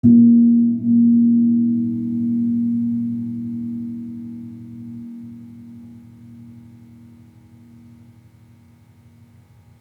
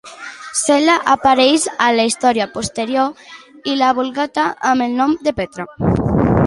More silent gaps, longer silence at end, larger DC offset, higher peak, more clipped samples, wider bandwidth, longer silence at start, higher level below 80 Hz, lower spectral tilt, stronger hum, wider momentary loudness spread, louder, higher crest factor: neither; first, 3.2 s vs 0 s; neither; about the same, -4 dBFS vs -2 dBFS; neither; second, 1 kHz vs 11.5 kHz; about the same, 0.05 s vs 0.05 s; second, -64 dBFS vs -38 dBFS; first, -12 dB/octave vs -4.5 dB/octave; neither; first, 24 LU vs 9 LU; about the same, -17 LUFS vs -16 LUFS; about the same, 16 dB vs 14 dB